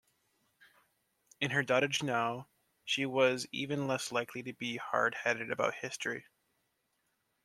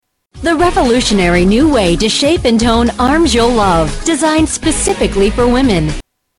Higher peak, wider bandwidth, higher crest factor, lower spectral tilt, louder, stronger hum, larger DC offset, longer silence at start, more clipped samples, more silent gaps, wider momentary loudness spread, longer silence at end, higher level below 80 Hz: second, -14 dBFS vs -2 dBFS; about the same, 14.5 kHz vs 13.5 kHz; first, 22 dB vs 8 dB; about the same, -4 dB/octave vs -4.5 dB/octave; second, -33 LUFS vs -11 LUFS; neither; neither; first, 1.4 s vs 0.35 s; neither; neither; first, 9 LU vs 4 LU; first, 1.25 s vs 0.4 s; second, -80 dBFS vs -24 dBFS